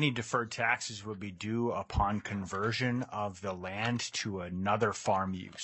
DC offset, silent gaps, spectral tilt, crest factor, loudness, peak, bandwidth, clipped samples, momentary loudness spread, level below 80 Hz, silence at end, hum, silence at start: under 0.1%; none; -4.5 dB/octave; 20 dB; -33 LUFS; -14 dBFS; 8.6 kHz; under 0.1%; 7 LU; -52 dBFS; 0 s; none; 0 s